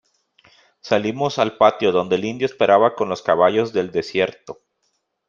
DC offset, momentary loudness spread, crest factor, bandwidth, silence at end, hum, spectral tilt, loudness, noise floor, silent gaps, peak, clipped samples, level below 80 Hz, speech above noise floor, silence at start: under 0.1%; 8 LU; 18 dB; 7.4 kHz; 0.75 s; none; -5.5 dB/octave; -19 LUFS; -71 dBFS; none; -2 dBFS; under 0.1%; -62 dBFS; 52 dB; 0.85 s